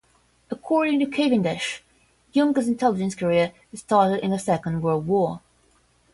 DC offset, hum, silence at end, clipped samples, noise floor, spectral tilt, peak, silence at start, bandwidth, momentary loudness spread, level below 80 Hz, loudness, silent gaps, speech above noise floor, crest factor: under 0.1%; none; 0.75 s; under 0.1%; -61 dBFS; -6 dB/octave; -6 dBFS; 0.5 s; 11.5 kHz; 10 LU; -60 dBFS; -23 LUFS; none; 40 dB; 18 dB